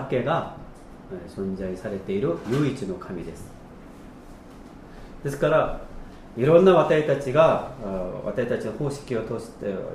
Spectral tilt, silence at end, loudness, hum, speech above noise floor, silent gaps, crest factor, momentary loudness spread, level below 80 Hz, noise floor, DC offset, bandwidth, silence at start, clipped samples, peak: -7 dB/octave; 0 s; -24 LUFS; none; 20 dB; none; 20 dB; 26 LU; -46 dBFS; -44 dBFS; under 0.1%; 13.5 kHz; 0 s; under 0.1%; -4 dBFS